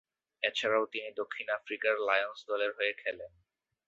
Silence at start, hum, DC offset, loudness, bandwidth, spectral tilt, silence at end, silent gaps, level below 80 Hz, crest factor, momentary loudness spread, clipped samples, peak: 0.4 s; none; under 0.1%; -33 LUFS; 8 kHz; 1 dB/octave; 0.6 s; none; -78 dBFS; 22 dB; 9 LU; under 0.1%; -12 dBFS